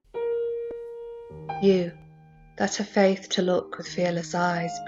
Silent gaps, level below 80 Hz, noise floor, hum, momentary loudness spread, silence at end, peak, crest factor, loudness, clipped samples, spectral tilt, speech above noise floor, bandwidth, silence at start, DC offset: none; -62 dBFS; -51 dBFS; none; 15 LU; 0 s; -8 dBFS; 20 dB; -26 LUFS; under 0.1%; -5 dB/octave; 27 dB; 8 kHz; 0.15 s; under 0.1%